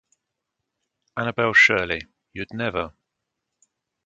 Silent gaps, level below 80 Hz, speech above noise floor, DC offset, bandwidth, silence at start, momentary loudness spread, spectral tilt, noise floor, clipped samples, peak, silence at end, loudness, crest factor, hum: none; -54 dBFS; 60 dB; under 0.1%; 9.2 kHz; 1.15 s; 20 LU; -4 dB/octave; -81 dBFS; under 0.1%; -4 dBFS; 1.15 s; -20 LUFS; 22 dB; none